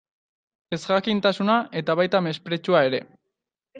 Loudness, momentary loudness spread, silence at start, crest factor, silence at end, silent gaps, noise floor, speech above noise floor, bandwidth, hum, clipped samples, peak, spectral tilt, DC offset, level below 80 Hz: -23 LUFS; 9 LU; 0.7 s; 20 dB; 0 s; none; -82 dBFS; 60 dB; 9.2 kHz; none; under 0.1%; -4 dBFS; -6 dB/octave; under 0.1%; -68 dBFS